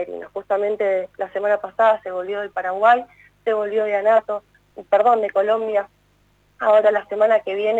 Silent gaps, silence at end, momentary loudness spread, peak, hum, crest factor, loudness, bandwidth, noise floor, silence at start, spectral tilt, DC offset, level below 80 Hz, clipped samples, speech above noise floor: none; 0 s; 11 LU; -4 dBFS; 50 Hz at -60 dBFS; 16 dB; -20 LUFS; 7.8 kHz; -59 dBFS; 0 s; -5 dB/octave; under 0.1%; -64 dBFS; under 0.1%; 40 dB